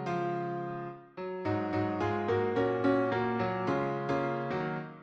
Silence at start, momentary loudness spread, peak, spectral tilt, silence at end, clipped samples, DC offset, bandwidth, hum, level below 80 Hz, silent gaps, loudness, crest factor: 0 s; 9 LU; -14 dBFS; -8 dB/octave; 0 s; under 0.1%; under 0.1%; 7.4 kHz; none; -64 dBFS; none; -32 LUFS; 16 dB